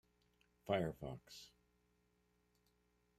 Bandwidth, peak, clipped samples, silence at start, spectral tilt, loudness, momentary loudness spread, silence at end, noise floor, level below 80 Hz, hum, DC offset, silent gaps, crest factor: 15 kHz; -24 dBFS; under 0.1%; 0.65 s; -6 dB/octave; -44 LUFS; 20 LU; 1.7 s; -80 dBFS; -72 dBFS; 60 Hz at -75 dBFS; under 0.1%; none; 24 dB